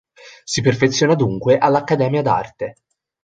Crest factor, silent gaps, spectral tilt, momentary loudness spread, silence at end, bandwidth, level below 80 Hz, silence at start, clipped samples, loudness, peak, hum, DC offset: 16 dB; none; -5.5 dB/octave; 14 LU; 0.5 s; 9.4 kHz; -52 dBFS; 0.25 s; under 0.1%; -17 LUFS; -2 dBFS; none; under 0.1%